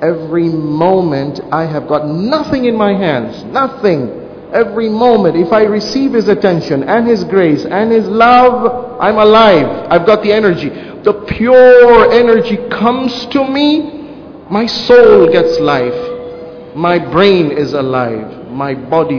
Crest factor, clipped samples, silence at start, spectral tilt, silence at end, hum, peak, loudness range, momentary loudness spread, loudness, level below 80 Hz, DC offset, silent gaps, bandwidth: 10 dB; 2%; 0 s; -7 dB/octave; 0 s; none; 0 dBFS; 6 LU; 12 LU; -10 LUFS; -42 dBFS; under 0.1%; none; 5.4 kHz